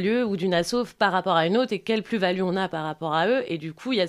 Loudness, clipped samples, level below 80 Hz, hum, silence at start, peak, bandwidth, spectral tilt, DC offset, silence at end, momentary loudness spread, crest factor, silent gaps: -24 LUFS; under 0.1%; -60 dBFS; none; 0 s; -6 dBFS; 14.5 kHz; -5.5 dB/octave; under 0.1%; 0 s; 6 LU; 18 dB; none